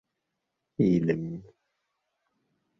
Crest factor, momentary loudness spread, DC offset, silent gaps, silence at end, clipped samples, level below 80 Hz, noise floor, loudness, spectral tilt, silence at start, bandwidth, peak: 20 dB; 19 LU; under 0.1%; none; 1.35 s; under 0.1%; -62 dBFS; -83 dBFS; -27 LUFS; -9.5 dB/octave; 0.8 s; 6.2 kHz; -12 dBFS